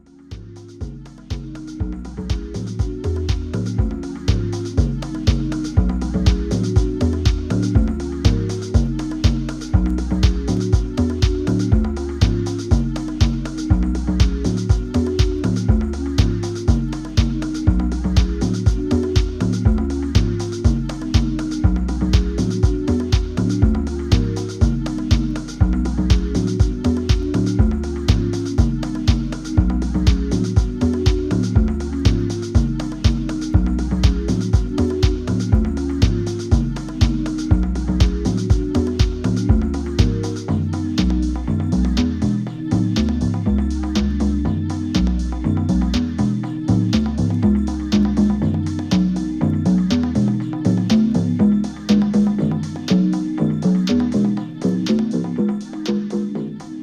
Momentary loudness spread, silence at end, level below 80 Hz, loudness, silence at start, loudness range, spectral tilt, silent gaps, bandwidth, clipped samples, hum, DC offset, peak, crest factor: 5 LU; 0 s; -24 dBFS; -20 LUFS; 0.3 s; 2 LU; -7 dB/octave; none; 10.5 kHz; under 0.1%; none; under 0.1%; 0 dBFS; 18 dB